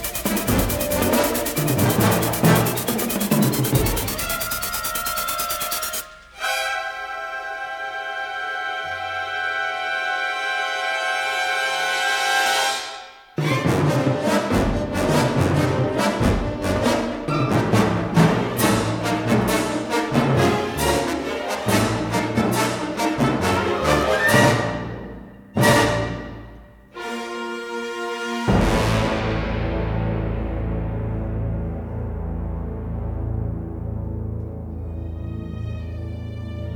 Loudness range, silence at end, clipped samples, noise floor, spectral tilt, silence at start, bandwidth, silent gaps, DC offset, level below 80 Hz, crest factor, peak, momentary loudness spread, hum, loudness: 8 LU; 0 s; under 0.1%; -43 dBFS; -4.5 dB/octave; 0 s; over 20 kHz; none; under 0.1%; -34 dBFS; 18 dB; -2 dBFS; 12 LU; none; -22 LUFS